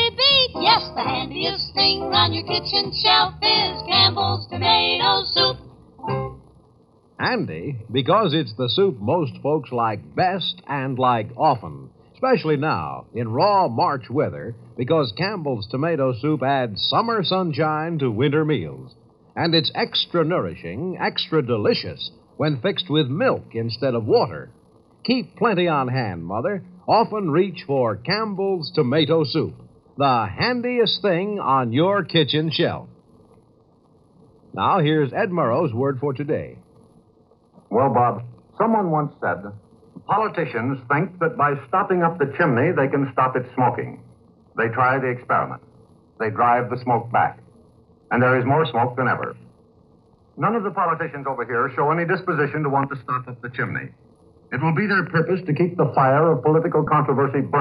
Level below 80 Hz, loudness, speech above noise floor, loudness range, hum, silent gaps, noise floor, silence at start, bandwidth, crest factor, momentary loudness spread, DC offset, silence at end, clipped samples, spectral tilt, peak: -56 dBFS; -21 LUFS; 36 dB; 5 LU; none; none; -56 dBFS; 0 s; 5.8 kHz; 20 dB; 10 LU; under 0.1%; 0 s; under 0.1%; -8.5 dB/octave; -2 dBFS